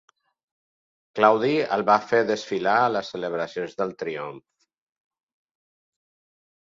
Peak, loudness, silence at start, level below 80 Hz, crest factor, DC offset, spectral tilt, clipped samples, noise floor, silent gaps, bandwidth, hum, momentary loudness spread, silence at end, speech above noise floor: -2 dBFS; -23 LUFS; 1.15 s; -72 dBFS; 24 dB; under 0.1%; -5.5 dB/octave; under 0.1%; under -90 dBFS; none; 7.6 kHz; none; 12 LU; 2.3 s; over 67 dB